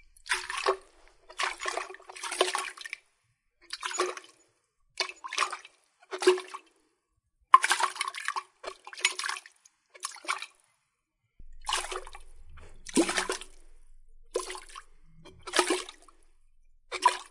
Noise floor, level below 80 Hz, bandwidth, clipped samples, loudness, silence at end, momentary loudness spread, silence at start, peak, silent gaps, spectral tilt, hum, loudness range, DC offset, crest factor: -79 dBFS; -56 dBFS; 11.5 kHz; under 0.1%; -30 LUFS; 0.05 s; 18 LU; 0.25 s; -2 dBFS; none; -1 dB/octave; none; 7 LU; under 0.1%; 32 dB